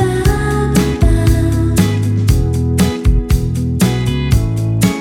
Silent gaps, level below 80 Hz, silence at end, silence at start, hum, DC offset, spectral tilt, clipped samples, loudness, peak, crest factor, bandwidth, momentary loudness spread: none; -18 dBFS; 0 s; 0 s; none; under 0.1%; -6.5 dB/octave; under 0.1%; -14 LUFS; 0 dBFS; 12 dB; 17.5 kHz; 3 LU